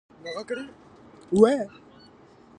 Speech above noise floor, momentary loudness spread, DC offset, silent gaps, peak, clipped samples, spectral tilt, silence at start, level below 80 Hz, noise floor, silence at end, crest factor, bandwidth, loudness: 29 dB; 18 LU; under 0.1%; none; -4 dBFS; under 0.1%; -6.5 dB/octave; 0.25 s; -62 dBFS; -53 dBFS; 0.9 s; 24 dB; 10 kHz; -24 LUFS